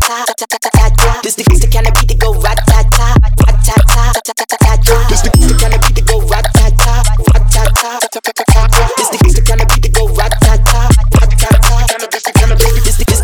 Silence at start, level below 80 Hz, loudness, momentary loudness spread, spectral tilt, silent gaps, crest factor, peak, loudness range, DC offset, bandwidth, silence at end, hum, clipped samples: 0 s; -8 dBFS; -10 LUFS; 4 LU; -4.5 dB/octave; none; 8 dB; 0 dBFS; 1 LU; under 0.1%; 19 kHz; 0 s; none; 0.7%